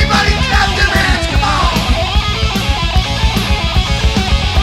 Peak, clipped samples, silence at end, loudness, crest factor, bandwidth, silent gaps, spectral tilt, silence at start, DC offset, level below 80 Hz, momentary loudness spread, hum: 0 dBFS; under 0.1%; 0 s; -13 LUFS; 12 dB; 15 kHz; none; -4.5 dB/octave; 0 s; under 0.1%; -16 dBFS; 3 LU; none